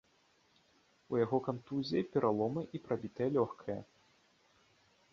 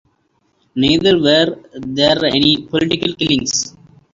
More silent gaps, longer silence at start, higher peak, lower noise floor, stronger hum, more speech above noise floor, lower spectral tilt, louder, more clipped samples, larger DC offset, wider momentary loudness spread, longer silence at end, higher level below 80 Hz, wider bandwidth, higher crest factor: neither; first, 1.1 s vs 0.75 s; second, -18 dBFS vs 0 dBFS; first, -71 dBFS vs -62 dBFS; neither; second, 36 dB vs 47 dB; first, -6.5 dB/octave vs -4 dB/octave; second, -36 LUFS vs -14 LUFS; neither; neither; about the same, 9 LU vs 11 LU; first, 1.3 s vs 0.45 s; second, -72 dBFS vs -46 dBFS; about the same, 7.2 kHz vs 7.8 kHz; about the same, 20 dB vs 16 dB